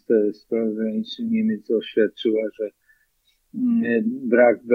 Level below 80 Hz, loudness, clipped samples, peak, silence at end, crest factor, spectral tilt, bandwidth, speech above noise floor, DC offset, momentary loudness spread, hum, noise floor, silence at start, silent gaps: -72 dBFS; -22 LUFS; under 0.1%; -4 dBFS; 0 s; 18 dB; -8 dB/octave; 6 kHz; 45 dB; under 0.1%; 11 LU; none; -66 dBFS; 0.1 s; none